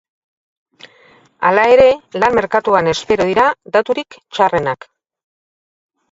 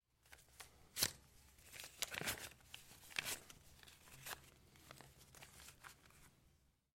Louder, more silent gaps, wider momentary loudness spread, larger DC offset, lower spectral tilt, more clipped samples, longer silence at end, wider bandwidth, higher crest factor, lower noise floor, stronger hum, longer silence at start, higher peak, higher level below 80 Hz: first, -14 LUFS vs -47 LUFS; neither; second, 11 LU vs 24 LU; neither; first, -5 dB/octave vs -0.5 dB/octave; neither; first, 1.35 s vs 0.35 s; second, 7.8 kHz vs 16.5 kHz; second, 16 dB vs 34 dB; second, -49 dBFS vs -75 dBFS; neither; first, 1.4 s vs 0.25 s; first, 0 dBFS vs -18 dBFS; first, -48 dBFS vs -72 dBFS